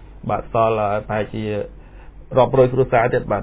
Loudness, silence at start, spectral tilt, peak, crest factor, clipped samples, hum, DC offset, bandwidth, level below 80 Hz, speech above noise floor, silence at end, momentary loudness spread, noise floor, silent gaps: -19 LUFS; 0 s; -11 dB/octave; -2 dBFS; 18 dB; under 0.1%; none; under 0.1%; 4 kHz; -40 dBFS; 21 dB; 0 s; 10 LU; -39 dBFS; none